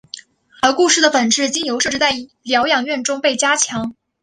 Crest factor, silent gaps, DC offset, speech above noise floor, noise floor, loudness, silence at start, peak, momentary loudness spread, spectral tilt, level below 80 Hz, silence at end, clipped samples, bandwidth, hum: 16 dB; none; under 0.1%; 22 dB; -38 dBFS; -16 LUFS; 0.15 s; 0 dBFS; 12 LU; -1 dB/octave; -56 dBFS; 0.3 s; under 0.1%; 11.5 kHz; none